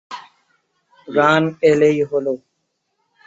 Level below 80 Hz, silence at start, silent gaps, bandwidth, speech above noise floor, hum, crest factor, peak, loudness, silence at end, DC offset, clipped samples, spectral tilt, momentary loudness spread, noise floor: -62 dBFS; 0.1 s; none; 7.8 kHz; 56 dB; none; 18 dB; -2 dBFS; -16 LUFS; 0.9 s; under 0.1%; under 0.1%; -6 dB/octave; 17 LU; -72 dBFS